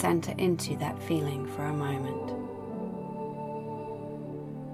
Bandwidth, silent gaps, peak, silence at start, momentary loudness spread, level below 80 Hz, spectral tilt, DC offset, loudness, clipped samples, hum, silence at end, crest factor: 16 kHz; none; -14 dBFS; 0 s; 10 LU; -64 dBFS; -6.5 dB/octave; under 0.1%; -33 LUFS; under 0.1%; none; 0 s; 20 dB